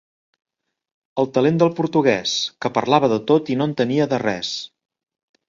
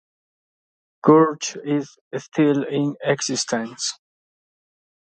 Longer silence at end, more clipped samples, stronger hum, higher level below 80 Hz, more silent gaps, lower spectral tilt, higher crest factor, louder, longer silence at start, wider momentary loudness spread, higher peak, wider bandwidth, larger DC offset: second, 0.85 s vs 1.15 s; neither; neither; first, -62 dBFS vs -72 dBFS; second, none vs 2.01-2.11 s; about the same, -5.5 dB/octave vs -4.5 dB/octave; about the same, 20 dB vs 20 dB; about the same, -19 LUFS vs -21 LUFS; about the same, 1.15 s vs 1.05 s; second, 8 LU vs 12 LU; about the same, 0 dBFS vs -2 dBFS; second, 7.6 kHz vs 9.2 kHz; neither